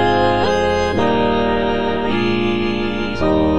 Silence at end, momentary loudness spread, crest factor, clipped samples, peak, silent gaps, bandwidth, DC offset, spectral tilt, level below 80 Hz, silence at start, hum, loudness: 0 s; 4 LU; 14 dB; under 0.1%; -4 dBFS; none; 10 kHz; 3%; -6 dB/octave; -34 dBFS; 0 s; none; -17 LUFS